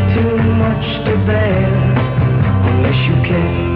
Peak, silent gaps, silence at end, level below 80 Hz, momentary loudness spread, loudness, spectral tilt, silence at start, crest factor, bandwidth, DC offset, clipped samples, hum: -2 dBFS; none; 0 s; -30 dBFS; 2 LU; -14 LUFS; -10.5 dB/octave; 0 s; 12 dB; 4.8 kHz; under 0.1%; under 0.1%; none